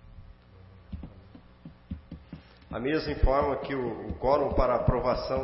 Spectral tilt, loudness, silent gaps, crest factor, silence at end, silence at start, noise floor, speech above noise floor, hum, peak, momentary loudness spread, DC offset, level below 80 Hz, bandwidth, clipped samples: -10.5 dB/octave; -28 LUFS; none; 18 dB; 0 s; 0.05 s; -52 dBFS; 26 dB; 60 Hz at -55 dBFS; -10 dBFS; 21 LU; under 0.1%; -36 dBFS; 5.8 kHz; under 0.1%